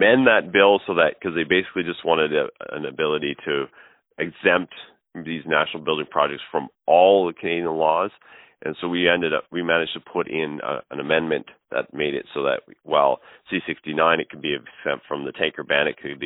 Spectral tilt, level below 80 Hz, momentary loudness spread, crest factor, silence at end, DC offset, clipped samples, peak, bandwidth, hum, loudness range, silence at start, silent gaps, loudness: -9.5 dB/octave; -62 dBFS; 13 LU; 20 dB; 0 s; under 0.1%; under 0.1%; -2 dBFS; 4.1 kHz; none; 4 LU; 0 s; none; -22 LUFS